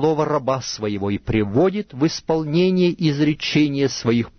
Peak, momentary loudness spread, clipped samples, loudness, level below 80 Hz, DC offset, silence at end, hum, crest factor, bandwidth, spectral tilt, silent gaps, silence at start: -6 dBFS; 6 LU; under 0.1%; -20 LUFS; -46 dBFS; under 0.1%; 0.1 s; none; 14 dB; 6.6 kHz; -6 dB/octave; none; 0 s